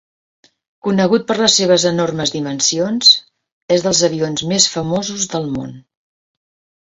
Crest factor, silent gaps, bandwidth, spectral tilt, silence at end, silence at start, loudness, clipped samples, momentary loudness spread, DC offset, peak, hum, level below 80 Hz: 18 dB; 3.52-3.69 s; 8.2 kHz; -3 dB/octave; 1.05 s; 0.85 s; -15 LUFS; under 0.1%; 10 LU; under 0.1%; 0 dBFS; none; -54 dBFS